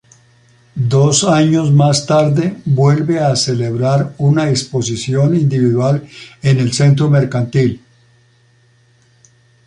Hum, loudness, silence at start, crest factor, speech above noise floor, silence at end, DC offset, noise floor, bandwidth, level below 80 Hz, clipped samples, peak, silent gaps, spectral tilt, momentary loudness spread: none; -14 LUFS; 0.75 s; 14 dB; 39 dB; 1.9 s; under 0.1%; -52 dBFS; 11 kHz; -50 dBFS; under 0.1%; 0 dBFS; none; -6 dB/octave; 7 LU